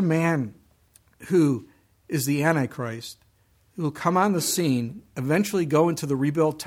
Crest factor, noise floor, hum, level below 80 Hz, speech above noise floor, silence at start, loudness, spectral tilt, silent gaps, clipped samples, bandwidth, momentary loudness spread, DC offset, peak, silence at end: 18 dB; -62 dBFS; none; -64 dBFS; 39 dB; 0 s; -24 LUFS; -5.5 dB/octave; none; under 0.1%; 16.5 kHz; 11 LU; under 0.1%; -6 dBFS; 0 s